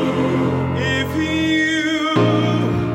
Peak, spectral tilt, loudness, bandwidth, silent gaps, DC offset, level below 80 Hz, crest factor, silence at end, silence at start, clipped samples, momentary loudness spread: -4 dBFS; -6 dB/octave; -18 LUFS; 16 kHz; none; under 0.1%; -42 dBFS; 14 dB; 0 s; 0 s; under 0.1%; 3 LU